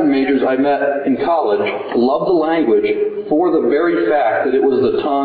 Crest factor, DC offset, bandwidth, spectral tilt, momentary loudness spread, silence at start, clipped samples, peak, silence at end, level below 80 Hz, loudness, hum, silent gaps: 10 dB; under 0.1%; 4.8 kHz; -9.5 dB/octave; 3 LU; 0 s; under 0.1%; -4 dBFS; 0 s; -54 dBFS; -15 LUFS; none; none